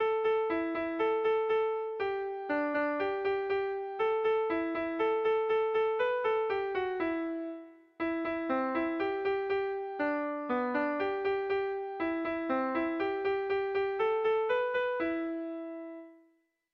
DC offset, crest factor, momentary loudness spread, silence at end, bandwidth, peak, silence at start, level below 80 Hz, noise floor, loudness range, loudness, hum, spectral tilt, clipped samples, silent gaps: under 0.1%; 14 dB; 7 LU; 0.6 s; 5.6 kHz; -18 dBFS; 0 s; -68 dBFS; -71 dBFS; 3 LU; -32 LUFS; none; -6.5 dB/octave; under 0.1%; none